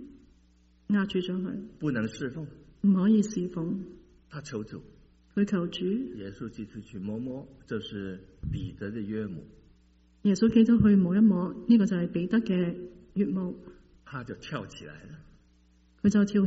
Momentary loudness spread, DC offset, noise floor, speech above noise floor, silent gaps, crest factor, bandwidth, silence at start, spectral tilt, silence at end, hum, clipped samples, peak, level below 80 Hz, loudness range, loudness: 20 LU; under 0.1%; -62 dBFS; 34 dB; none; 18 dB; 8 kHz; 0 s; -7.5 dB/octave; 0 s; none; under 0.1%; -10 dBFS; -54 dBFS; 13 LU; -28 LUFS